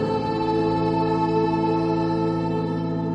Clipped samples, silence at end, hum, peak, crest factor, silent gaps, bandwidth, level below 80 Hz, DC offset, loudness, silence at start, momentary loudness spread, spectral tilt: under 0.1%; 0 s; none; -10 dBFS; 12 dB; none; 8 kHz; -48 dBFS; under 0.1%; -23 LUFS; 0 s; 3 LU; -8.5 dB/octave